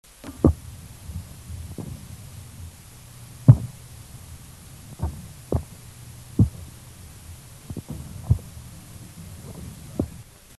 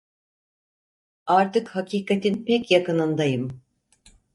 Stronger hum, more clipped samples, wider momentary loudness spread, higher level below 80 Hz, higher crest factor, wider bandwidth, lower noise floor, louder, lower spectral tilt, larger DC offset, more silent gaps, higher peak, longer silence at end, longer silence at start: neither; neither; first, 21 LU vs 9 LU; first, -38 dBFS vs -66 dBFS; first, 28 dB vs 20 dB; first, 13 kHz vs 11.5 kHz; second, -45 dBFS vs -58 dBFS; second, -26 LUFS vs -23 LUFS; first, -8 dB/octave vs -6 dB/octave; neither; neither; first, 0 dBFS vs -4 dBFS; second, 0.35 s vs 0.75 s; second, 0.25 s vs 1.25 s